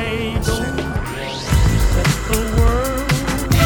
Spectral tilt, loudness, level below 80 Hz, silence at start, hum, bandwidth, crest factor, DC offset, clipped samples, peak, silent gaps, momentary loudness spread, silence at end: -5 dB/octave; -19 LUFS; -22 dBFS; 0 s; none; 20 kHz; 16 dB; under 0.1%; under 0.1%; -2 dBFS; none; 7 LU; 0 s